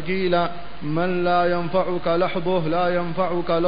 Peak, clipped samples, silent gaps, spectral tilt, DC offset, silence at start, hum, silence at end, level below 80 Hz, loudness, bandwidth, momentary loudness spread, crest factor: -8 dBFS; under 0.1%; none; -11.5 dB/octave; 4%; 0 s; none; 0 s; -48 dBFS; -22 LUFS; 5.2 kHz; 4 LU; 16 dB